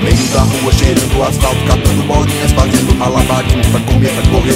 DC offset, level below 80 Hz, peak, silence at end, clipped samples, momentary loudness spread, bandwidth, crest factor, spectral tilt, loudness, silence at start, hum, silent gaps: 0.3%; -16 dBFS; 0 dBFS; 0 s; 0.4%; 2 LU; 16.5 kHz; 10 dB; -5 dB/octave; -11 LUFS; 0 s; none; none